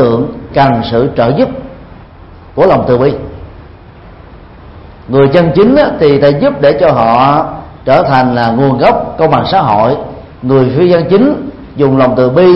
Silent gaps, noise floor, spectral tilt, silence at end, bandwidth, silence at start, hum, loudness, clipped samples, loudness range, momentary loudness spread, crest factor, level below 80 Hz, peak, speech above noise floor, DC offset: none; -33 dBFS; -9.5 dB/octave; 0 s; 5.8 kHz; 0 s; none; -9 LUFS; 0.2%; 5 LU; 13 LU; 10 dB; -34 dBFS; 0 dBFS; 25 dB; under 0.1%